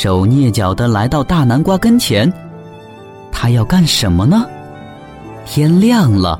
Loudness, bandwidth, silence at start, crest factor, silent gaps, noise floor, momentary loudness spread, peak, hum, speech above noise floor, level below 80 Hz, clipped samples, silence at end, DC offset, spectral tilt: -12 LUFS; 16.5 kHz; 0 s; 12 dB; none; -34 dBFS; 22 LU; -2 dBFS; none; 23 dB; -32 dBFS; under 0.1%; 0 s; under 0.1%; -6 dB/octave